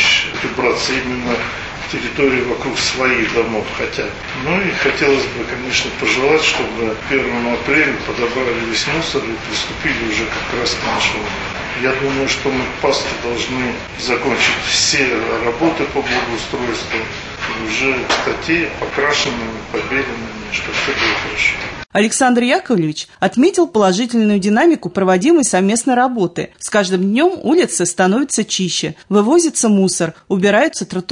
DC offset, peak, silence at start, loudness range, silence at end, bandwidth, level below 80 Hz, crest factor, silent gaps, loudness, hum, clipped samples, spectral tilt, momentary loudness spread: under 0.1%; -2 dBFS; 0 s; 4 LU; 0 s; 11 kHz; -40 dBFS; 14 dB; none; -16 LUFS; none; under 0.1%; -3.5 dB/octave; 8 LU